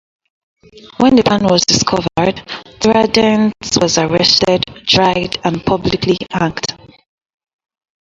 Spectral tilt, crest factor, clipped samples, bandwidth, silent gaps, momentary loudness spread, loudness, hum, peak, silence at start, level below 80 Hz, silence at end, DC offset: -4 dB/octave; 14 dB; under 0.1%; 8 kHz; none; 8 LU; -13 LUFS; none; 0 dBFS; 0.75 s; -42 dBFS; 1.25 s; under 0.1%